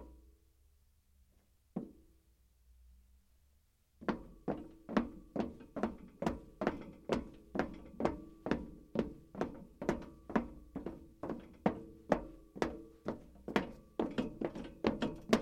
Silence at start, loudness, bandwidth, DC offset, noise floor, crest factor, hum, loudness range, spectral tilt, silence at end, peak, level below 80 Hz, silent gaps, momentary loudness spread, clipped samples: 0 s; -41 LUFS; 15.5 kHz; under 0.1%; -72 dBFS; 28 dB; none; 9 LU; -6.5 dB/octave; 0 s; -12 dBFS; -58 dBFS; none; 10 LU; under 0.1%